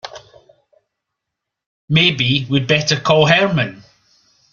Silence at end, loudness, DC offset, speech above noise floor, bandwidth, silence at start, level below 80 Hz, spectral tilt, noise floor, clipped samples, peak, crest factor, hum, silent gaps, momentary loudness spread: 0.75 s; -15 LUFS; under 0.1%; 66 dB; 7.2 kHz; 0.05 s; -52 dBFS; -5 dB/octave; -80 dBFS; under 0.1%; 0 dBFS; 18 dB; none; 1.66-1.88 s; 8 LU